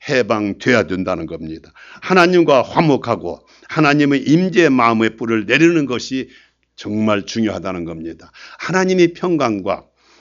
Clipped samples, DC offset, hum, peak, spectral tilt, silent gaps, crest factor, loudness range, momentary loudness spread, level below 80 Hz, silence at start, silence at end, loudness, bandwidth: under 0.1%; under 0.1%; none; 0 dBFS; -6 dB/octave; none; 16 dB; 5 LU; 17 LU; -52 dBFS; 0.05 s; 0.4 s; -16 LUFS; 7.6 kHz